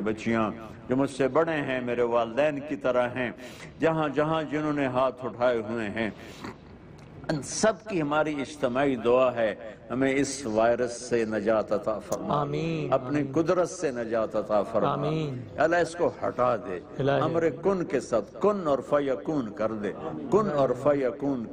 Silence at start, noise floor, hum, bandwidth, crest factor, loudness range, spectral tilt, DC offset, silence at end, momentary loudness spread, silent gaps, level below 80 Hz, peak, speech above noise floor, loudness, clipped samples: 0 s; -47 dBFS; none; 15 kHz; 16 dB; 3 LU; -5.5 dB/octave; under 0.1%; 0 s; 8 LU; none; -58 dBFS; -10 dBFS; 20 dB; -27 LUFS; under 0.1%